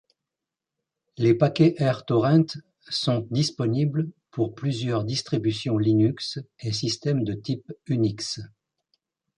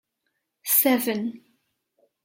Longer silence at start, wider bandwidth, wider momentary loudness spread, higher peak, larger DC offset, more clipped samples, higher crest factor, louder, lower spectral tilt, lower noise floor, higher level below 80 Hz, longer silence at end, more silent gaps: first, 1.2 s vs 0.65 s; second, 10.5 kHz vs 16.5 kHz; second, 11 LU vs 16 LU; about the same, -6 dBFS vs -8 dBFS; neither; neither; about the same, 18 dB vs 20 dB; second, -25 LUFS vs -21 LUFS; first, -6.5 dB/octave vs -3 dB/octave; first, -87 dBFS vs -78 dBFS; first, -60 dBFS vs -78 dBFS; about the same, 0.9 s vs 0.85 s; neither